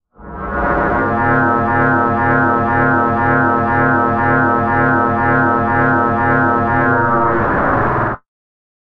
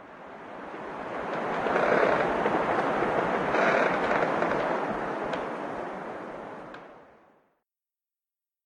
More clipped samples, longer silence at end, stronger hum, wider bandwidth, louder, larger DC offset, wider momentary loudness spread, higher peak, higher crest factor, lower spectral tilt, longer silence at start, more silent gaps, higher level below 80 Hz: neither; second, 0.75 s vs 1.6 s; neither; second, 5.4 kHz vs 11 kHz; first, -14 LUFS vs -27 LUFS; neither; second, 3 LU vs 18 LU; first, -2 dBFS vs -10 dBFS; about the same, 14 dB vs 18 dB; first, -10 dB/octave vs -6 dB/octave; first, 0.2 s vs 0 s; neither; first, -34 dBFS vs -60 dBFS